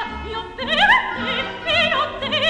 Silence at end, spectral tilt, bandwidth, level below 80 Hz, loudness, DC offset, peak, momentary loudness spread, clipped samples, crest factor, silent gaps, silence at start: 0 s; -3.5 dB/octave; 12 kHz; -42 dBFS; -18 LUFS; under 0.1%; -2 dBFS; 13 LU; under 0.1%; 18 dB; none; 0 s